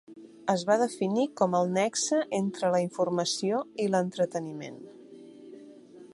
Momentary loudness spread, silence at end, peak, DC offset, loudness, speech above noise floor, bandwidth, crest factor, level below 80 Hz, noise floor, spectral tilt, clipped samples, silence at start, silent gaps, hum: 22 LU; 0.05 s; -10 dBFS; under 0.1%; -28 LUFS; 22 dB; 11.5 kHz; 20 dB; -76 dBFS; -50 dBFS; -4.5 dB/octave; under 0.1%; 0.1 s; none; none